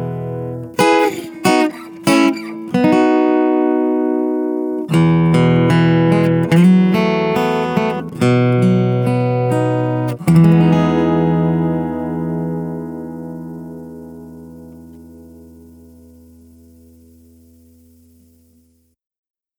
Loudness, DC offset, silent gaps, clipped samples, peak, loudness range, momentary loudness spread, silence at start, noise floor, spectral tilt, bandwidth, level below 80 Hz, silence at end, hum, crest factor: -15 LUFS; under 0.1%; none; under 0.1%; 0 dBFS; 14 LU; 16 LU; 0 s; -57 dBFS; -7.5 dB/octave; 19.5 kHz; -48 dBFS; 4.2 s; none; 14 dB